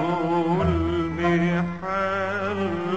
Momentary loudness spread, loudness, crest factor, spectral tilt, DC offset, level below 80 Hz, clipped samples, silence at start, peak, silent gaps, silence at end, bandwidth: 4 LU; -24 LUFS; 14 dB; -7.5 dB/octave; 0.5%; -42 dBFS; under 0.1%; 0 s; -10 dBFS; none; 0 s; 8 kHz